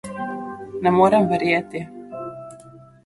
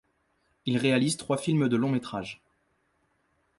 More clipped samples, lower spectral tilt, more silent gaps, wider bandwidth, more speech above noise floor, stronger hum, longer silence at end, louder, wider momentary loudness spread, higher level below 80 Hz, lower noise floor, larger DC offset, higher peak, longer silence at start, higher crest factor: neither; first, -7 dB/octave vs -5.5 dB/octave; neither; about the same, 11.5 kHz vs 11.5 kHz; second, 28 dB vs 46 dB; neither; second, 0.25 s vs 1.25 s; first, -19 LUFS vs -27 LUFS; first, 19 LU vs 13 LU; first, -58 dBFS vs -66 dBFS; second, -45 dBFS vs -72 dBFS; neither; first, -4 dBFS vs -10 dBFS; second, 0.05 s vs 0.65 s; about the same, 18 dB vs 18 dB